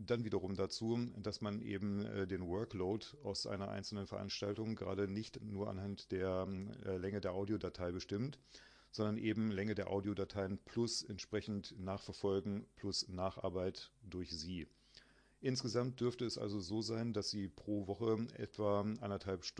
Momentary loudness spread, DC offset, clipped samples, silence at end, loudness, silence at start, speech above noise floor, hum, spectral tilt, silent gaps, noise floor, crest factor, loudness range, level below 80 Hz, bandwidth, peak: 7 LU; under 0.1%; under 0.1%; 0.1 s; -42 LUFS; 0 s; 25 dB; none; -5.5 dB/octave; none; -66 dBFS; 18 dB; 2 LU; -68 dBFS; 10.5 kHz; -24 dBFS